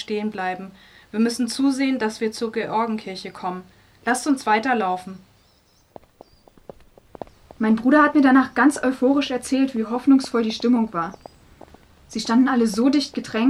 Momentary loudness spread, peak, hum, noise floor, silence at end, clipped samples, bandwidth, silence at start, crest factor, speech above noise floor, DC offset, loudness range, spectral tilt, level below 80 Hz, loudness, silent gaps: 15 LU; -4 dBFS; none; -58 dBFS; 0 s; under 0.1%; 13 kHz; 0 s; 16 dB; 38 dB; under 0.1%; 7 LU; -4.5 dB/octave; -58 dBFS; -21 LUFS; none